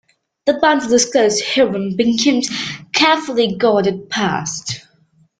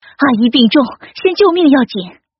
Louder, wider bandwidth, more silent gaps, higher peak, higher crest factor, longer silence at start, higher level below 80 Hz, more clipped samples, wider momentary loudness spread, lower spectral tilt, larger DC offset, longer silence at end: second, -16 LUFS vs -12 LUFS; first, 9.6 kHz vs 5.8 kHz; neither; about the same, -2 dBFS vs 0 dBFS; about the same, 16 dB vs 12 dB; first, 0.45 s vs 0.2 s; about the same, -56 dBFS vs -54 dBFS; neither; about the same, 9 LU vs 10 LU; about the same, -3 dB/octave vs -3 dB/octave; neither; first, 0.6 s vs 0.3 s